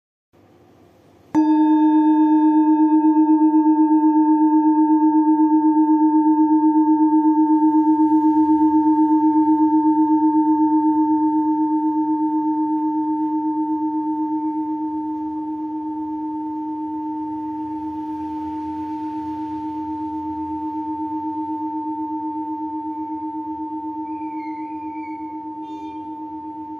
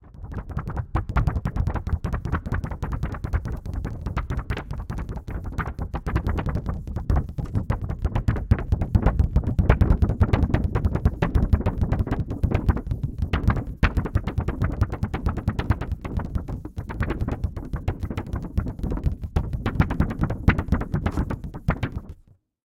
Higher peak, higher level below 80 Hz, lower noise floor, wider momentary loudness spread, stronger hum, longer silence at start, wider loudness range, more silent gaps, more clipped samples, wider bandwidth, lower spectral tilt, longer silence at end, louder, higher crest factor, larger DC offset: second, -8 dBFS vs -2 dBFS; second, -64 dBFS vs -28 dBFS; second, -51 dBFS vs -55 dBFS; first, 13 LU vs 9 LU; neither; first, 1.35 s vs 0.05 s; first, 12 LU vs 7 LU; neither; neither; second, 3.8 kHz vs 8 kHz; about the same, -9 dB/octave vs -8.5 dB/octave; second, 0 s vs 0.5 s; first, -19 LUFS vs -26 LUFS; second, 12 dB vs 22 dB; neither